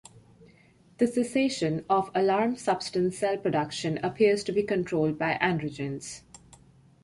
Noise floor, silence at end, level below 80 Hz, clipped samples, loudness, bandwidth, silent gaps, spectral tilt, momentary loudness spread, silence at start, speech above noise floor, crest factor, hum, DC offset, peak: -59 dBFS; 0.85 s; -62 dBFS; under 0.1%; -27 LUFS; 11.5 kHz; none; -5.5 dB/octave; 8 LU; 0.15 s; 32 dB; 20 dB; none; under 0.1%; -8 dBFS